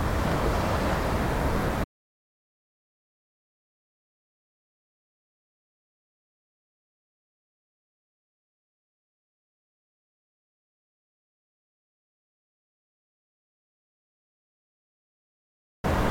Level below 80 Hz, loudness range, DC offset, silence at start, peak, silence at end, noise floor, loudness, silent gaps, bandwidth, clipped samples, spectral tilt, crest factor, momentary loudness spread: -40 dBFS; 12 LU; under 0.1%; 0 s; -14 dBFS; 0 s; under -90 dBFS; -28 LUFS; 1.84-15.84 s; 17 kHz; under 0.1%; -6 dB/octave; 20 dB; 6 LU